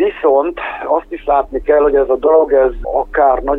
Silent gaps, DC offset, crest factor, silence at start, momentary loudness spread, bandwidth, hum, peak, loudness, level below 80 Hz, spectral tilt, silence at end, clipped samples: none; under 0.1%; 12 dB; 0 s; 7 LU; 3.9 kHz; none; 0 dBFS; -14 LUFS; -32 dBFS; -8 dB/octave; 0 s; under 0.1%